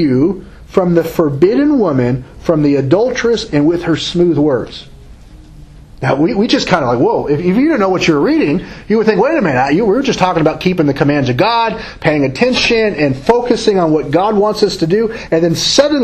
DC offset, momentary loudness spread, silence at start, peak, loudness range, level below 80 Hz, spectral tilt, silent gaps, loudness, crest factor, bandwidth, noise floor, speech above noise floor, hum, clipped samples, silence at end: under 0.1%; 5 LU; 0 s; 0 dBFS; 3 LU; -38 dBFS; -5.5 dB/octave; none; -13 LUFS; 12 dB; 14 kHz; -36 dBFS; 24 dB; none; 0.1%; 0 s